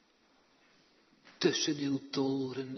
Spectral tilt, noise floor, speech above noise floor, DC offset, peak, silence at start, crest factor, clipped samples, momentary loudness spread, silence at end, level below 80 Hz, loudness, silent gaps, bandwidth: -4 dB/octave; -68 dBFS; 36 dB; under 0.1%; -14 dBFS; 1.25 s; 22 dB; under 0.1%; 5 LU; 0 s; -82 dBFS; -33 LUFS; none; 6.4 kHz